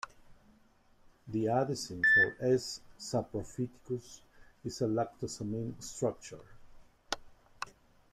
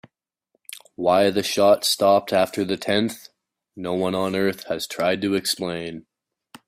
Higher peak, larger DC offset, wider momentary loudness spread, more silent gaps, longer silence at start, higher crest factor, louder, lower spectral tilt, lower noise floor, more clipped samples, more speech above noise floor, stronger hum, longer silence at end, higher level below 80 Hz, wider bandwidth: second, -12 dBFS vs -4 dBFS; neither; first, 20 LU vs 17 LU; neither; second, 0.05 s vs 0.75 s; about the same, 22 dB vs 18 dB; second, -33 LUFS vs -21 LUFS; about the same, -4.5 dB/octave vs -4 dB/octave; second, -65 dBFS vs -72 dBFS; neither; second, 31 dB vs 51 dB; neither; second, 0.4 s vs 0.65 s; about the same, -62 dBFS vs -62 dBFS; about the same, 15 kHz vs 16 kHz